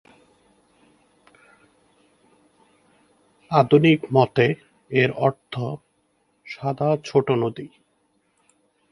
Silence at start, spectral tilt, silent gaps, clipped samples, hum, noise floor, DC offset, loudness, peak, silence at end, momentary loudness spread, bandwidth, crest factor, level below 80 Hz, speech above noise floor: 3.5 s; -7.5 dB/octave; none; under 0.1%; 50 Hz at -65 dBFS; -67 dBFS; under 0.1%; -21 LUFS; -2 dBFS; 1.25 s; 17 LU; 11 kHz; 24 dB; -64 dBFS; 47 dB